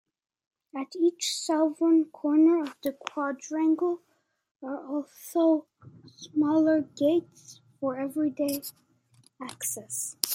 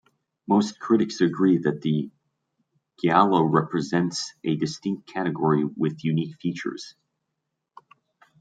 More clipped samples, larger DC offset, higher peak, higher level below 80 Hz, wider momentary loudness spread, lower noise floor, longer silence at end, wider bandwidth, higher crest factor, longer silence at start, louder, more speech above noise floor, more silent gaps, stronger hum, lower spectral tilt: neither; neither; first, 0 dBFS vs -4 dBFS; second, -82 dBFS vs -68 dBFS; first, 15 LU vs 11 LU; second, -63 dBFS vs -81 dBFS; second, 0 s vs 1.5 s; first, 16.5 kHz vs 9.2 kHz; first, 28 dB vs 20 dB; first, 0.75 s vs 0.5 s; second, -27 LUFS vs -24 LUFS; second, 36 dB vs 58 dB; first, 4.51-4.55 s vs none; neither; second, -3.5 dB/octave vs -6.5 dB/octave